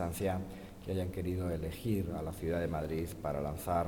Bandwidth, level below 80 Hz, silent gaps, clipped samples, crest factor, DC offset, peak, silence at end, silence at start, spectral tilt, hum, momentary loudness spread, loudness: 18 kHz; -50 dBFS; none; under 0.1%; 16 dB; under 0.1%; -20 dBFS; 0 s; 0 s; -7 dB/octave; none; 4 LU; -37 LUFS